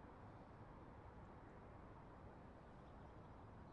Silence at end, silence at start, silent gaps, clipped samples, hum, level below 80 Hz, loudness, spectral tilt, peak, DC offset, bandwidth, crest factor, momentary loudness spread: 0 s; 0 s; none; under 0.1%; none; -68 dBFS; -61 LUFS; -7 dB/octave; -48 dBFS; under 0.1%; 6.8 kHz; 12 dB; 1 LU